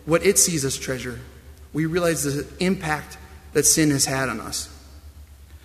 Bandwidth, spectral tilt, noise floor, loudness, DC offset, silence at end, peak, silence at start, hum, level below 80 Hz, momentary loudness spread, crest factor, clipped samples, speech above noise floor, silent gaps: 15.5 kHz; -3.5 dB/octave; -44 dBFS; -21 LUFS; under 0.1%; 0.1 s; -4 dBFS; 0.05 s; none; -44 dBFS; 17 LU; 20 dB; under 0.1%; 22 dB; none